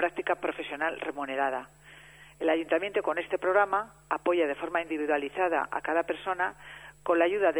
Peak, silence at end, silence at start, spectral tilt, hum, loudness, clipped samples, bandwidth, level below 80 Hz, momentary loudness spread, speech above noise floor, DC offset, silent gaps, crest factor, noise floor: -10 dBFS; 0 s; 0 s; -5 dB/octave; none; -29 LUFS; under 0.1%; over 20 kHz; -64 dBFS; 8 LU; 23 dB; under 0.1%; none; 18 dB; -52 dBFS